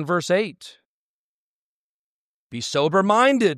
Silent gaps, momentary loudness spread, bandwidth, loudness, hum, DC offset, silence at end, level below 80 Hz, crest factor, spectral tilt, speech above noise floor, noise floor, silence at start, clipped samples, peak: 0.85-2.50 s; 14 LU; 13.5 kHz; -20 LUFS; none; under 0.1%; 0 s; -72 dBFS; 18 dB; -4.5 dB/octave; over 70 dB; under -90 dBFS; 0 s; under 0.1%; -4 dBFS